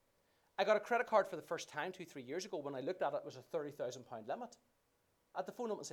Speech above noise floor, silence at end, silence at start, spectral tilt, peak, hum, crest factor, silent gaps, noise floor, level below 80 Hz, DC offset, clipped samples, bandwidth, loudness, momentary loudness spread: 38 dB; 0 s; 0.6 s; -4 dB/octave; -18 dBFS; none; 22 dB; none; -79 dBFS; -86 dBFS; under 0.1%; under 0.1%; 17.5 kHz; -41 LUFS; 13 LU